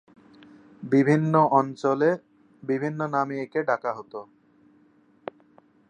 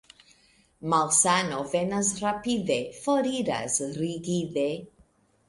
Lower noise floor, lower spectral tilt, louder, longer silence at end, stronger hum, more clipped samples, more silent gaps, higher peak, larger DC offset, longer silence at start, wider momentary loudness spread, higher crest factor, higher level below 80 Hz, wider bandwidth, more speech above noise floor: about the same, -60 dBFS vs -62 dBFS; first, -8.5 dB/octave vs -3.5 dB/octave; about the same, -24 LUFS vs -26 LUFS; first, 1.65 s vs 0.65 s; neither; neither; neither; about the same, -6 dBFS vs -8 dBFS; neither; about the same, 0.8 s vs 0.8 s; first, 22 LU vs 10 LU; about the same, 20 dB vs 20 dB; second, -76 dBFS vs -62 dBFS; second, 9.2 kHz vs 11.5 kHz; about the same, 36 dB vs 36 dB